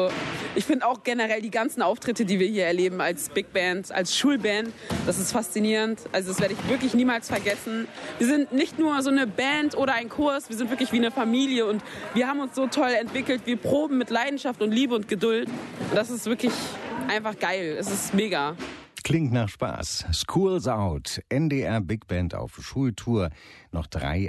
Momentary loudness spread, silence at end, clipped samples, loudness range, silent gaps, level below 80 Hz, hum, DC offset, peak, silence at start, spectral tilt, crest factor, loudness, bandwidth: 7 LU; 0 s; under 0.1%; 3 LU; none; -46 dBFS; none; under 0.1%; -10 dBFS; 0 s; -4.5 dB/octave; 16 dB; -26 LUFS; 12.5 kHz